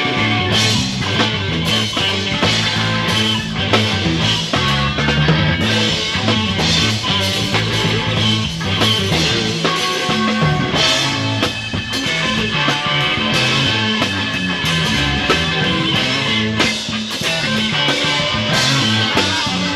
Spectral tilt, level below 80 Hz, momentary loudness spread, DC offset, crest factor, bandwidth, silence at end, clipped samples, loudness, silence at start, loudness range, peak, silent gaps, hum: -4 dB/octave; -36 dBFS; 3 LU; under 0.1%; 14 dB; 14.5 kHz; 0 s; under 0.1%; -15 LUFS; 0 s; 1 LU; -2 dBFS; none; none